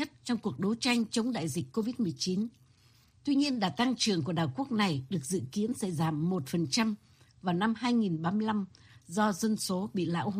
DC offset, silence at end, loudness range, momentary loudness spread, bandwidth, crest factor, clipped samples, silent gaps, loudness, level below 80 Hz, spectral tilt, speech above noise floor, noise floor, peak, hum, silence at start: under 0.1%; 0 s; 1 LU; 6 LU; 15.5 kHz; 18 dB; under 0.1%; none; -31 LUFS; -68 dBFS; -5 dB/octave; 32 dB; -63 dBFS; -14 dBFS; none; 0 s